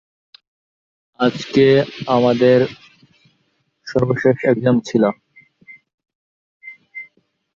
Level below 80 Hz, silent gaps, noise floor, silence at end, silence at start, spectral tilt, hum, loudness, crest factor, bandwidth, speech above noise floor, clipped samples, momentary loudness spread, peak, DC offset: -56 dBFS; 5.94-5.98 s, 6.15-6.60 s; -66 dBFS; 0.5 s; 1.2 s; -7 dB/octave; none; -16 LUFS; 16 dB; 7.4 kHz; 51 dB; under 0.1%; 21 LU; -2 dBFS; under 0.1%